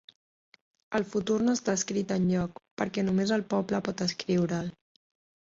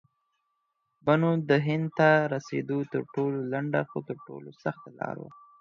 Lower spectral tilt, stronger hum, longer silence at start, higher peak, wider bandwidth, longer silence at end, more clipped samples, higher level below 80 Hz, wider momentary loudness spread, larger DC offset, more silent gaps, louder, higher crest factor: second, -5.5 dB/octave vs -8 dB/octave; neither; second, 0.9 s vs 1.05 s; second, -14 dBFS vs -8 dBFS; first, 7.8 kHz vs 7 kHz; first, 0.85 s vs 0.3 s; neither; first, -62 dBFS vs -72 dBFS; second, 7 LU vs 16 LU; neither; first, 2.71-2.77 s vs none; about the same, -29 LUFS vs -28 LUFS; about the same, 16 dB vs 20 dB